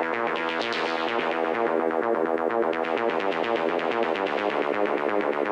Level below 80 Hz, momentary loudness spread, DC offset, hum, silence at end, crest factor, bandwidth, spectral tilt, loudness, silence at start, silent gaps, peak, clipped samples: -70 dBFS; 1 LU; under 0.1%; none; 0 s; 12 dB; 9.8 kHz; -5 dB/octave; -25 LUFS; 0 s; none; -14 dBFS; under 0.1%